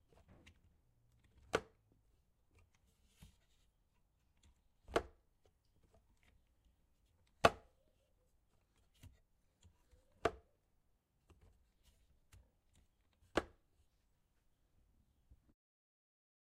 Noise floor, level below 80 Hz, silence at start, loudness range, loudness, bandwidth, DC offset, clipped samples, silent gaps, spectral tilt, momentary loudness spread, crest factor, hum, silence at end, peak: -79 dBFS; -68 dBFS; 1.55 s; 8 LU; -40 LUFS; 13.5 kHz; under 0.1%; under 0.1%; none; -4 dB/octave; 21 LU; 38 dB; none; 3.1 s; -10 dBFS